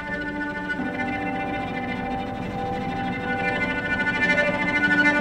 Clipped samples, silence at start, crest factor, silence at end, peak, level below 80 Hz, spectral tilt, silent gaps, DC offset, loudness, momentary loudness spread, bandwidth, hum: under 0.1%; 0 s; 18 dB; 0 s; -8 dBFS; -46 dBFS; -5.5 dB/octave; none; under 0.1%; -24 LUFS; 9 LU; 12.5 kHz; none